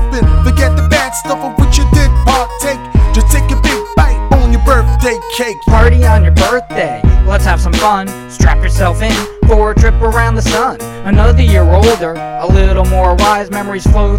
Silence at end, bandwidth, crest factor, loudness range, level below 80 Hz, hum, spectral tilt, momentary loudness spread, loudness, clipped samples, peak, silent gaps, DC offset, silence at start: 0 s; 16 kHz; 8 dB; 1 LU; -12 dBFS; none; -5.5 dB/octave; 8 LU; -11 LUFS; 0.6%; 0 dBFS; none; under 0.1%; 0 s